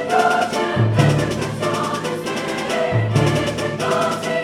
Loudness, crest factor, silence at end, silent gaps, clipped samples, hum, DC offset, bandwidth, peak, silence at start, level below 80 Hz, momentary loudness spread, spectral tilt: -19 LUFS; 16 dB; 0 s; none; under 0.1%; none; under 0.1%; 15.5 kHz; -2 dBFS; 0 s; -44 dBFS; 7 LU; -5.5 dB/octave